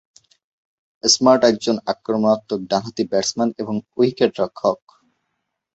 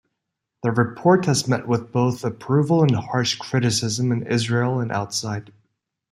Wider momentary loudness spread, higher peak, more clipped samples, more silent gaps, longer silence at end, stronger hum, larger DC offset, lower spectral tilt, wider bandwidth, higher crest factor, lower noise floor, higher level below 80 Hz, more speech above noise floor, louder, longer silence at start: about the same, 9 LU vs 8 LU; about the same, -2 dBFS vs -4 dBFS; neither; neither; first, 1 s vs 0.7 s; neither; neither; second, -3.5 dB/octave vs -5.5 dB/octave; second, 8.2 kHz vs 14 kHz; about the same, 20 dB vs 18 dB; second, -76 dBFS vs -80 dBFS; about the same, -62 dBFS vs -60 dBFS; about the same, 57 dB vs 60 dB; about the same, -19 LUFS vs -21 LUFS; first, 1.05 s vs 0.65 s